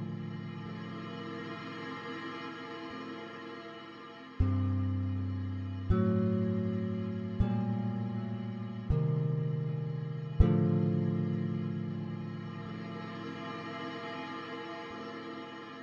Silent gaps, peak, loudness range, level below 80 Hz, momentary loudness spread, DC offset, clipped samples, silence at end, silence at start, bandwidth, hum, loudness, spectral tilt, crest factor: none; -12 dBFS; 9 LU; -44 dBFS; 13 LU; under 0.1%; under 0.1%; 0 s; 0 s; 7 kHz; none; -35 LUFS; -9 dB/octave; 22 dB